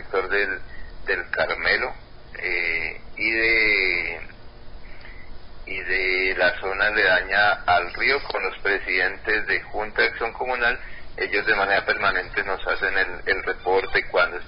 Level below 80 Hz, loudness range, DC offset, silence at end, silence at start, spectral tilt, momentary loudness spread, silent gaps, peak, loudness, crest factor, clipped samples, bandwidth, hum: -44 dBFS; 3 LU; under 0.1%; 0 s; 0 s; -7.5 dB/octave; 12 LU; none; -8 dBFS; -22 LUFS; 16 dB; under 0.1%; 5.4 kHz; none